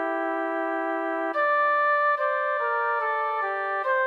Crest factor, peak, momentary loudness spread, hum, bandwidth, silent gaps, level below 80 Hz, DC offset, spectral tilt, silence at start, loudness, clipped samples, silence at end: 12 dB; -14 dBFS; 6 LU; none; 5.6 kHz; none; under -90 dBFS; under 0.1%; -3 dB/octave; 0 s; -25 LUFS; under 0.1%; 0 s